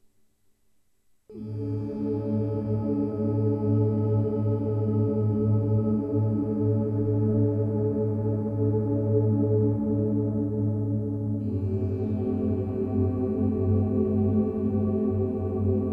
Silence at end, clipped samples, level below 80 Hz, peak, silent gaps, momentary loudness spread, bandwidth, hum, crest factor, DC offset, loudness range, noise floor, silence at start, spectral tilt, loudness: 0 s; under 0.1%; -50 dBFS; -12 dBFS; none; 4 LU; 2.7 kHz; none; 12 dB; under 0.1%; 2 LU; -69 dBFS; 1.3 s; -13 dB/octave; -26 LUFS